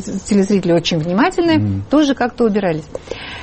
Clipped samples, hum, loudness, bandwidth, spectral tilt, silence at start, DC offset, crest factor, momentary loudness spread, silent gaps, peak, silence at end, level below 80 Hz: under 0.1%; none; -16 LUFS; 8.8 kHz; -6 dB/octave; 0 s; under 0.1%; 12 dB; 11 LU; none; -4 dBFS; 0 s; -42 dBFS